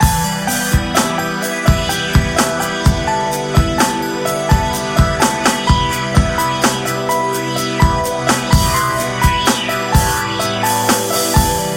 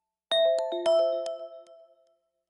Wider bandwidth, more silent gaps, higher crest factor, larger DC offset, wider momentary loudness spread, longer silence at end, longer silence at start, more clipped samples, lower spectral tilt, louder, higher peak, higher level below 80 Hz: first, 16.5 kHz vs 11 kHz; neither; about the same, 14 dB vs 12 dB; neither; second, 4 LU vs 15 LU; second, 0 s vs 0.9 s; second, 0 s vs 0.3 s; neither; first, -4 dB/octave vs -2 dB/octave; first, -15 LUFS vs -26 LUFS; first, 0 dBFS vs -16 dBFS; first, -24 dBFS vs -82 dBFS